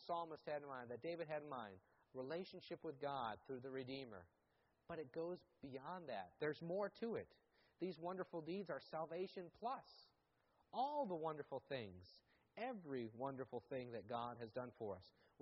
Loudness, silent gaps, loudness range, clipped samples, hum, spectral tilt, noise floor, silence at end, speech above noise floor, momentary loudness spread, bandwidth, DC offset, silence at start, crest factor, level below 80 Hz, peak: -50 LUFS; none; 3 LU; under 0.1%; none; -4.5 dB/octave; -82 dBFS; 0.35 s; 33 dB; 11 LU; 5.6 kHz; under 0.1%; 0 s; 18 dB; -84 dBFS; -32 dBFS